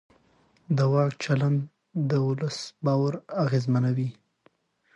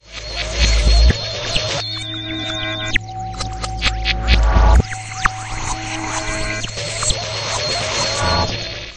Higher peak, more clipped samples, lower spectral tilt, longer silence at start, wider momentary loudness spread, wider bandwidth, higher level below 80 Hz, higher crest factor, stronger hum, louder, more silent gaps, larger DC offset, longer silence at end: second, -10 dBFS vs 0 dBFS; neither; first, -7.5 dB/octave vs -3.5 dB/octave; first, 0.7 s vs 0.05 s; second, 7 LU vs 10 LU; second, 8.2 kHz vs 9.8 kHz; second, -68 dBFS vs -20 dBFS; about the same, 16 dB vs 18 dB; neither; second, -26 LUFS vs -19 LUFS; neither; neither; first, 0.85 s vs 0 s